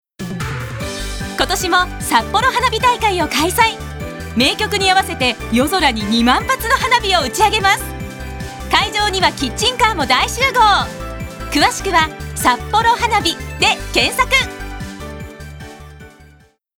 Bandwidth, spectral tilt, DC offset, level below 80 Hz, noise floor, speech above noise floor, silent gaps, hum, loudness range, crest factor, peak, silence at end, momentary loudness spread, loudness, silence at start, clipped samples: over 20 kHz; -3 dB/octave; under 0.1%; -32 dBFS; -49 dBFS; 33 dB; none; none; 2 LU; 16 dB; 0 dBFS; 0.7 s; 15 LU; -15 LUFS; 0.2 s; under 0.1%